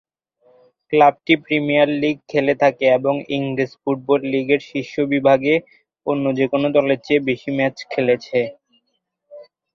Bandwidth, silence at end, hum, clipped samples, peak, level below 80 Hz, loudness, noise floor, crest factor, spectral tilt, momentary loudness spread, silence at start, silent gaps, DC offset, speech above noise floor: 7 kHz; 0.3 s; none; under 0.1%; -2 dBFS; -62 dBFS; -18 LUFS; -73 dBFS; 18 dB; -7 dB/octave; 8 LU; 0.9 s; none; under 0.1%; 55 dB